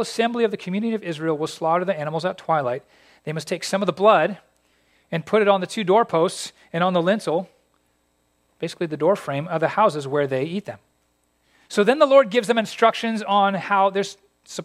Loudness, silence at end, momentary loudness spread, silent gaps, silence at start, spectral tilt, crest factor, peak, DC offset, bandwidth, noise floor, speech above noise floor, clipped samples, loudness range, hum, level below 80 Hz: -21 LUFS; 0 s; 14 LU; none; 0 s; -5 dB/octave; 20 dB; -2 dBFS; under 0.1%; 14.5 kHz; -67 dBFS; 46 dB; under 0.1%; 5 LU; none; -72 dBFS